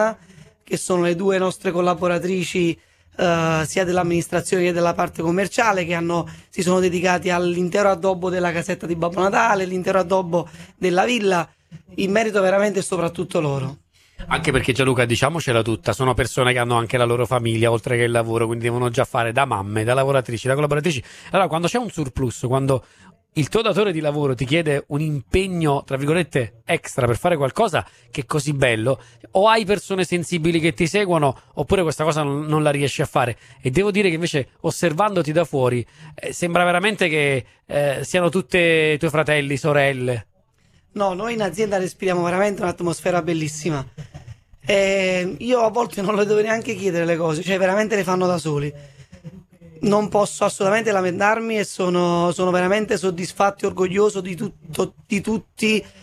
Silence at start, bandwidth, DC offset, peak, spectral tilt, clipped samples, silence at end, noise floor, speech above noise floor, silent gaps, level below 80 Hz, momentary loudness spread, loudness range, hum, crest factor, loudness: 0 s; 14 kHz; under 0.1%; -2 dBFS; -5.5 dB/octave; under 0.1%; 0.15 s; -58 dBFS; 38 dB; none; -46 dBFS; 7 LU; 3 LU; none; 18 dB; -20 LUFS